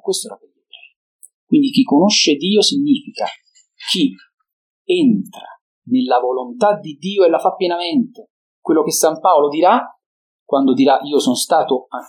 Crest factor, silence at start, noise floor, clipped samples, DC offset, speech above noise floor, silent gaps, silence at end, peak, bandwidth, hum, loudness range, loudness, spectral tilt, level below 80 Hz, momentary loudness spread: 16 dB; 0.05 s; -45 dBFS; under 0.1%; under 0.1%; 30 dB; 0.96-1.19 s, 1.34-1.47 s, 4.34-4.38 s, 4.53-4.85 s, 5.61-5.82 s, 8.30-8.63 s, 10.06-10.46 s; 0.05 s; 0 dBFS; 17 kHz; none; 4 LU; -16 LUFS; -4 dB/octave; -74 dBFS; 11 LU